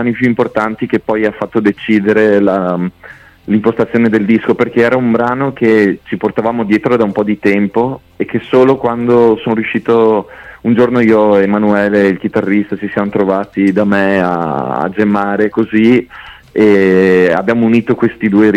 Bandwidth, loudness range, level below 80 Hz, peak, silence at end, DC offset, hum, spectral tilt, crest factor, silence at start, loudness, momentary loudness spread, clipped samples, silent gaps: 8.8 kHz; 2 LU; -48 dBFS; 0 dBFS; 0 s; under 0.1%; none; -8 dB/octave; 10 dB; 0 s; -12 LUFS; 7 LU; under 0.1%; none